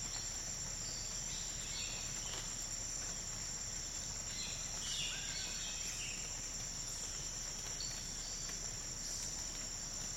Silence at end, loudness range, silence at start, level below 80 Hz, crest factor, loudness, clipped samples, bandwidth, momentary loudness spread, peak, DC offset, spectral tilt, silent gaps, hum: 0 s; 1 LU; 0 s; -54 dBFS; 16 dB; -40 LUFS; under 0.1%; 16 kHz; 2 LU; -28 dBFS; under 0.1%; -0.5 dB/octave; none; none